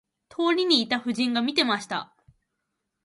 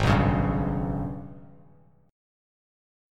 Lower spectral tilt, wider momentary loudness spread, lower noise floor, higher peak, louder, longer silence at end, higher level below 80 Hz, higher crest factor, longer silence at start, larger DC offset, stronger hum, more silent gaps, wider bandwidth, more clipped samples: second, -3.5 dB/octave vs -7.5 dB/octave; second, 12 LU vs 17 LU; first, -80 dBFS vs -57 dBFS; about the same, -6 dBFS vs -8 dBFS; about the same, -24 LUFS vs -26 LUFS; about the same, 1 s vs 0.95 s; second, -72 dBFS vs -38 dBFS; about the same, 20 dB vs 20 dB; first, 0.4 s vs 0 s; neither; neither; neither; about the same, 11.5 kHz vs 11.5 kHz; neither